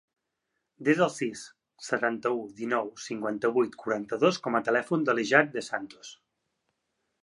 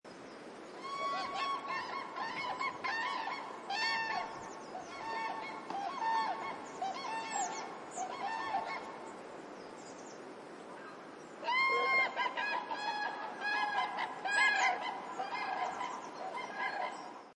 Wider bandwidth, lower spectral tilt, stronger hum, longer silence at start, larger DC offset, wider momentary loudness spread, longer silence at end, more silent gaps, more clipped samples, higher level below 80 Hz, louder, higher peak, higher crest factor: about the same, 11.5 kHz vs 11.5 kHz; first, -5 dB/octave vs -1.5 dB/octave; neither; first, 0.8 s vs 0.05 s; neither; about the same, 16 LU vs 18 LU; first, 1.1 s vs 0 s; neither; neither; about the same, -78 dBFS vs -82 dBFS; first, -28 LUFS vs -36 LUFS; first, -6 dBFS vs -18 dBFS; about the same, 24 dB vs 20 dB